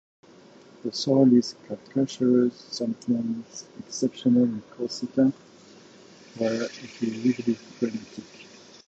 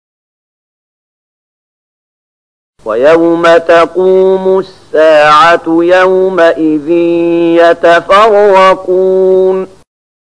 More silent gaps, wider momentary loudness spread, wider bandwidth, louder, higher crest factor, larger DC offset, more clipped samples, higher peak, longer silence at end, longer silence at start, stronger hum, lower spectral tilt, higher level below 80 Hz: neither; first, 19 LU vs 7 LU; second, 8 kHz vs 10.5 kHz; second, -26 LUFS vs -7 LUFS; first, 18 dB vs 8 dB; second, under 0.1% vs 0.7%; second, under 0.1% vs 0.3%; second, -8 dBFS vs 0 dBFS; second, 0.45 s vs 0.65 s; second, 0.85 s vs 2.85 s; neither; about the same, -6 dB/octave vs -5.5 dB/octave; second, -70 dBFS vs -46 dBFS